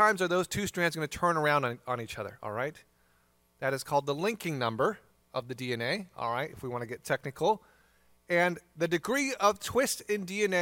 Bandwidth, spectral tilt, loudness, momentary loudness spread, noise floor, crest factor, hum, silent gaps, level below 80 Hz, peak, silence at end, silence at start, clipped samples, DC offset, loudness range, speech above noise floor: 17 kHz; -4 dB/octave; -31 LUFS; 10 LU; -68 dBFS; 20 dB; none; none; -64 dBFS; -10 dBFS; 0 s; 0 s; under 0.1%; under 0.1%; 4 LU; 38 dB